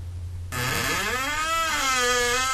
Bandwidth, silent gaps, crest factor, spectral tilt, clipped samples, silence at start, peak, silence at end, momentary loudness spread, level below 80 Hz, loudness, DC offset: 14 kHz; none; 14 dB; -2 dB/octave; under 0.1%; 0 s; -12 dBFS; 0 s; 11 LU; -42 dBFS; -23 LUFS; under 0.1%